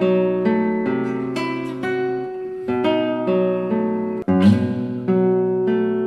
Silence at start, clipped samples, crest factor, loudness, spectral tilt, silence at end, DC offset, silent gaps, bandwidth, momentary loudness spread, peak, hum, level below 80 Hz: 0 s; under 0.1%; 16 dB; -20 LUFS; -8.5 dB/octave; 0 s; under 0.1%; none; 9.8 kHz; 8 LU; -4 dBFS; none; -58 dBFS